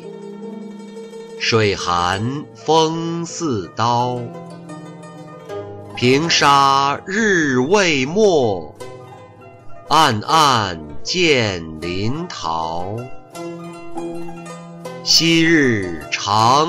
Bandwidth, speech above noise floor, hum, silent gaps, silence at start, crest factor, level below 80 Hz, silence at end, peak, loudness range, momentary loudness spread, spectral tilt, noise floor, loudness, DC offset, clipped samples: 16 kHz; 24 dB; none; none; 0 s; 16 dB; -50 dBFS; 0 s; -2 dBFS; 7 LU; 21 LU; -4 dB/octave; -41 dBFS; -16 LUFS; under 0.1%; under 0.1%